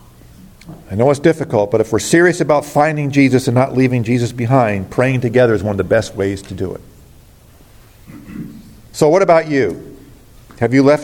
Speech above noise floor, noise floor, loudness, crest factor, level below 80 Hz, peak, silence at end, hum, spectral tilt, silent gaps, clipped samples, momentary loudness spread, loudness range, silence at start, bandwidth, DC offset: 30 dB; -44 dBFS; -14 LUFS; 14 dB; -46 dBFS; 0 dBFS; 0 s; none; -6.5 dB/octave; none; under 0.1%; 14 LU; 7 LU; 0.65 s; 17 kHz; under 0.1%